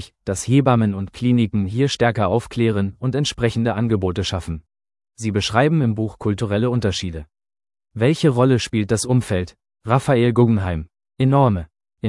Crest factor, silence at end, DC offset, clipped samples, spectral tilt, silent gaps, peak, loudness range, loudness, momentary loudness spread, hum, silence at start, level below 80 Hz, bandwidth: 18 dB; 0 s; under 0.1%; under 0.1%; -6.5 dB/octave; none; 0 dBFS; 3 LU; -19 LUFS; 11 LU; none; 0 s; -46 dBFS; 12 kHz